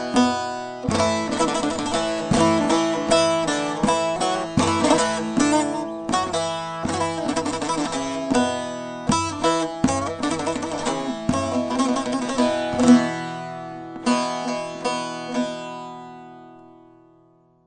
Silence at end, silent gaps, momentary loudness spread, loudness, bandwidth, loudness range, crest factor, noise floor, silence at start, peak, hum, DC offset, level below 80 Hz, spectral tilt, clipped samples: 0.95 s; none; 10 LU; -22 LUFS; 9.6 kHz; 7 LU; 20 dB; -56 dBFS; 0 s; -2 dBFS; none; under 0.1%; -50 dBFS; -4 dB/octave; under 0.1%